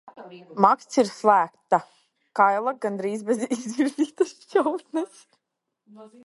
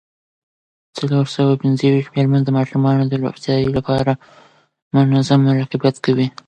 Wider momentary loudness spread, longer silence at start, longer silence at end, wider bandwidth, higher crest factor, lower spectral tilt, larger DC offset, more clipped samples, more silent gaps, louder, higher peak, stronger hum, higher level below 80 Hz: first, 11 LU vs 6 LU; second, 0.05 s vs 0.95 s; about the same, 0.2 s vs 0.15 s; first, 11.5 kHz vs 9 kHz; first, 24 dB vs 16 dB; second, -5 dB/octave vs -8 dB/octave; neither; neither; second, none vs 4.82-4.91 s; second, -24 LUFS vs -17 LUFS; about the same, -2 dBFS vs -2 dBFS; neither; second, -76 dBFS vs -50 dBFS